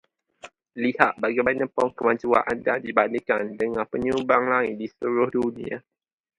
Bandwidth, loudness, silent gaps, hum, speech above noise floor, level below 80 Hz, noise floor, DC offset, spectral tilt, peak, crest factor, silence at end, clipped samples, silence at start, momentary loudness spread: 11 kHz; -24 LUFS; none; none; 25 dB; -60 dBFS; -49 dBFS; under 0.1%; -6.5 dB/octave; 0 dBFS; 24 dB; 0.6 s; under 0.1%; 0.45 s; 8 LU